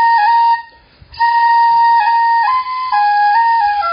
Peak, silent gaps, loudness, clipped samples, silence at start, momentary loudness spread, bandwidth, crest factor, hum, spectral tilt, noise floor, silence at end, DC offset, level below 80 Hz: -4 dBFS; none; -12 LUFS; under 0.1%; 0 s; 6 LU; 5.2 kHz; 8 dB; none; 3.5 dB/octave; -42 dBFS; 0 s; under 0.1%; -52 dBFS